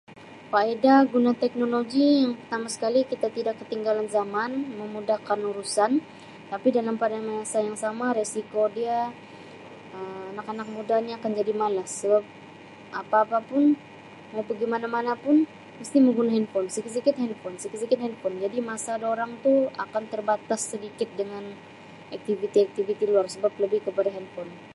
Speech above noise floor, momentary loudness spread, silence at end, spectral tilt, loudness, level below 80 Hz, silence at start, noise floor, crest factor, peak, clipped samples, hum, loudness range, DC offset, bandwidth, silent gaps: 20 dB; 16 LU; 0 s; -4.5 dB/octave; -26 LUFS; -74 dBFS; 0.1 s; -46 dBFS; 20 dB; -6 dBFS; under 0.1%; none; 4 LU; under 0.1%; 11.5 kHz; none